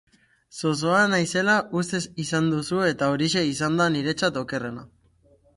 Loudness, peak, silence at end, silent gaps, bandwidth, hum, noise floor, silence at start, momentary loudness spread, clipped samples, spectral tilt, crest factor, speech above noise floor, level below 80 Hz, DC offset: -23 LUFS; -8 dBFS; 0.7 s; none; 11.5 kHz; none; -60 dBFS; 0.55 s; 9 LU; under 0.1%; -4.5 dB/octave; 18 dB; 36 dB; -60 dBFS; under 0.1%